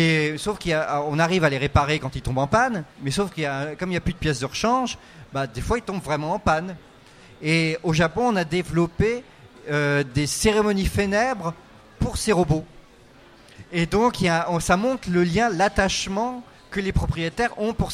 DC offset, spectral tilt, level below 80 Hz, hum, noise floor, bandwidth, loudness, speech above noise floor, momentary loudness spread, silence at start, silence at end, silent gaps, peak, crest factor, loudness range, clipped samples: under 0.1%; -5 dB/octave; -38 dBFS; none; -50 dBFS; 15.5 kHz; -23 LUFS; 27 dB; 9 LU; 0 s; 0 s; none; -4 dBFS; 18 dB; 3 LU; under 0.1%